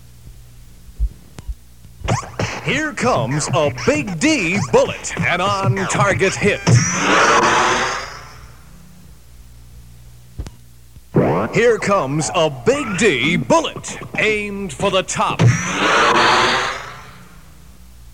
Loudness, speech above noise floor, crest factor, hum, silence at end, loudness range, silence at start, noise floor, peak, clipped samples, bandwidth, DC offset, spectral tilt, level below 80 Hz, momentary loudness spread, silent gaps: -16 LUFS; 28 dB; 18 dB; none; 0.05 s; 7 LU; 0.25 s; -44 dBFS; 0 dBFS; under 0.1%; 16 kHz; 0.6%; -4.5 dB/octave; -38 dBFS; 16 LU; none